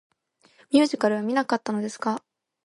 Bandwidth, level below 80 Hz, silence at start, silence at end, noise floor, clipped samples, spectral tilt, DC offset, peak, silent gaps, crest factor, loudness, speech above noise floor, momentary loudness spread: 11.5 kHz; -74 dBFS; 0.7 s; 0.45 s; -62 dBFS; under 0.1%; -5 dB/octave; under 0.1%; -6 dBFS; none; 18 dB; -25 LUFS; 39 dB; 8 LU